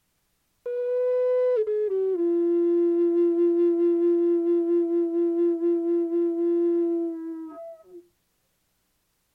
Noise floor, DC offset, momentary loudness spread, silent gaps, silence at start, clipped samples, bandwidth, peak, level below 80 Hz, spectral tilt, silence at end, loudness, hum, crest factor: -72 dBFS; under 0.1%; 11 LU; none; 0.65 s; under 0.1%; 2.9 kHz; -16 dBFS; -78 dBFS; -7.5 dB/octave; 1.35 s; -24 LUFS; none; 8 dB